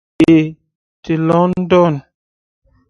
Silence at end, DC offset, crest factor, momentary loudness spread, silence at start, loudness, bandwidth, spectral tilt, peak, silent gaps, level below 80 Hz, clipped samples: 0.9 s; under 0.1%; 16 dB; 11 LU; 0.2 s; -13 LUFS; 7.8 kHz; -8.5 dB/octave; 0 dBFS; 0.75-1.03 s; -48 dBFS; under 0.1%